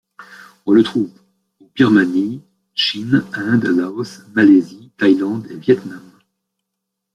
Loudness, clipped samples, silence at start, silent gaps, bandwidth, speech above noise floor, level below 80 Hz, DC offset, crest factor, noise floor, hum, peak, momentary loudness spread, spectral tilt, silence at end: -16 LUFS; under 0.1%; 0.2 s; none; 10.5 kHz; 63 dB; -60 dBFS; under 0.1%; 16 dB; -78 dBFS; none; -2 dBFS; 15 LU; -6.5 dB/octave; 1.15 s